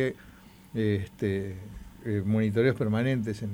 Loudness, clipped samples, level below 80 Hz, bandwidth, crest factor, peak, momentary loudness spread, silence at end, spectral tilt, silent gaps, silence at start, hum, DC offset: -29 LUFS; under 0.1%; -54 dBFS; 16 kHz; 18 dB; -10 dBFS; 15 LU; 0 s; -8 dB/octave; none; 0 s; none; under 0.1%